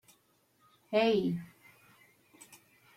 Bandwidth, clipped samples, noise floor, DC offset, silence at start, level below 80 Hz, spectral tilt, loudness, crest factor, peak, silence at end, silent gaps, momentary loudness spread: 16 kHz; under 0.1%; -71 dBFS; under 0.1%; 0.9 s; -74 dBFS; -6 dB/octave; -31 LUFS; 20 dB; -16 dBFS; 1.5 s; none; 27 LU